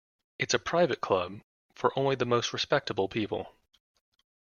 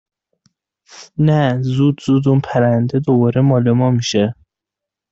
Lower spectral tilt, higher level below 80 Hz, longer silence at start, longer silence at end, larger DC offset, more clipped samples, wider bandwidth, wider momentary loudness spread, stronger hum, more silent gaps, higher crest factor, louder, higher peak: second, -4 dB/octave vs -7.5 dB/octave; second, -66 dBFS vs -54 dBFS; second, 0.4 s vs 0.95 s; first, 0.95 s vs 0.8 s; neither; neither; about the same, 7.2 kHz vs 7.8 kHz; first, 10 LU vs 4 LU; neither; first, 1.44-1.69 s vs none; first, 22 dB vs 12 dB; second, -29 LUFS vs -15 LUFS; second, -10 dBFS vs -4 dBFS